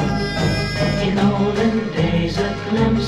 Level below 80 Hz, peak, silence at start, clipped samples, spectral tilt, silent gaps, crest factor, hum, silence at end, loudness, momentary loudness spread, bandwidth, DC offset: -34 dBFS; -4 dBFS; 0 s; under 0.1%; -6.5 dB/octave; none; 14 dB; none; 0 s; -19 LUFS; 3 LU; 12.5 kHz; under 0.1%